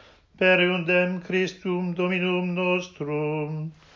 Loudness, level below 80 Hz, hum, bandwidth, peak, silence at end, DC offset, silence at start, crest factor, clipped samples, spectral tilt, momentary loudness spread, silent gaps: -24 LUFS; -64 dBFS; none; 7.2 kHz; -8 dBFS; 0.25 s; under 0.1%; 0.4 s; 16 dB; under 0.1%; -6.5 dB/octave; 9 LU; none